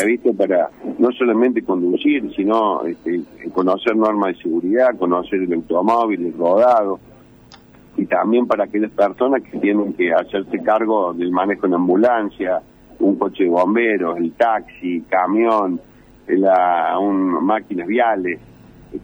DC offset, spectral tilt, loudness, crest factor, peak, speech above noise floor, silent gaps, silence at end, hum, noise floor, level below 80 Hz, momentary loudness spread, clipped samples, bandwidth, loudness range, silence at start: under 0.1%; -7.5 dB/octave; -18 LUFS; 16 dB; -2 dBFS; 28 dB; none; 0 s; none; -45 dBFS; -56 dBFS; 8 LU; under 0.1%; over 20 kHz; 1 LU; 0 s